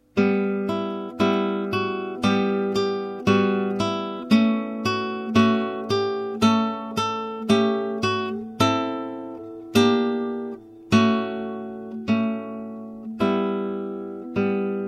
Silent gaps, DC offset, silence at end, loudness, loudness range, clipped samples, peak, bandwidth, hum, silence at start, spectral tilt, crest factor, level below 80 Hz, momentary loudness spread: none; under 0.1%; 0 s; -23 LUFS; 3 LU; under 0.1%; -6 dBFS; 14 kHz; none; 0.15 s; -6 dB/octave; 18 dB; -60 dBFS; 13 LU